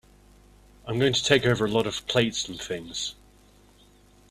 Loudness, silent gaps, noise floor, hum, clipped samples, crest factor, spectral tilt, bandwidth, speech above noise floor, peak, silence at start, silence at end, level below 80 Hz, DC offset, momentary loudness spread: -25 LUFS; none; -56 dBFS; 50 Hz at -50 dBFS; under 0.1%; 26 dB; -4 dB/octave; 14.5 kHz; 31 dB; -2 dBFS; 0.85 s; 1.2 s; -54 dBFS; under 0.1%; 12 LU